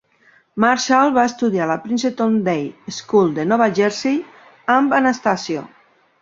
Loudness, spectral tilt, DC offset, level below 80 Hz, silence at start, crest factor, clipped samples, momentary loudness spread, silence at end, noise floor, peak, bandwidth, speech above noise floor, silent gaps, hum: -18 LUFS; -5 dB/octave; under 0.1%; -62 dBFS; 0.55 s; 18 dB; under 0.1%; 11 LU; 0.55 s; -55 dBFS; -2 dBFS; 7.8 kHz; 38 dB; none; none